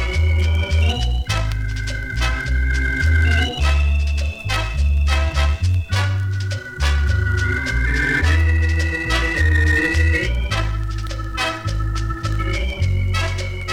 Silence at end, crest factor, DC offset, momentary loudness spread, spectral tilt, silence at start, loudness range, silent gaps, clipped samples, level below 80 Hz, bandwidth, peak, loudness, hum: 0 s; 12 dB; under 0.1%; 7 LU; -5 dB/octave; 0 s; 3 LU; none; under 0.1%; -20 dBFS; 12 kHz; -6 dBFS; -20 LUFS; none